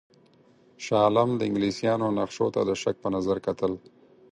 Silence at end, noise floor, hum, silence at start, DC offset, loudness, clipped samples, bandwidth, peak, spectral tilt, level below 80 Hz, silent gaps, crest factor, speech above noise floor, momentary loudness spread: 0.55 s; -59 dBFS; none; 0.8 s; under 0.1%; -26 LUFS; under 0.1%; 10.5 kHz; -8 dBFS; -6 dB/octave; -60 dBFS; none; 20 dB; 33 dB; 8 LU